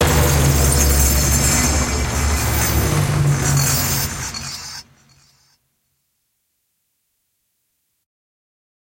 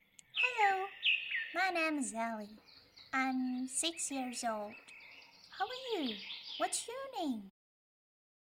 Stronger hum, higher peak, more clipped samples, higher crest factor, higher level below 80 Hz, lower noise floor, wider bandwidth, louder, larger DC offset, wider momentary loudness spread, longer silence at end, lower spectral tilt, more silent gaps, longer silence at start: neither; first, -2 dBFS vs -18 dBFS; neither; about the same, 18 dB vs 20 dB; first, -26 dBFS vs -80 dBFS; first, -70 dBFS vs -58 dBFS; about the same, 16.5 kHz vs 16.5 kHz; first, -16 LUFS vs -36 LUFS; neither; second, 12 LU vs 16 LU; first, 4.05 s vs 1 s; first, -3.5 dB/octave vs -1 dB/octave; neither; second, 0 s vs 0.35 s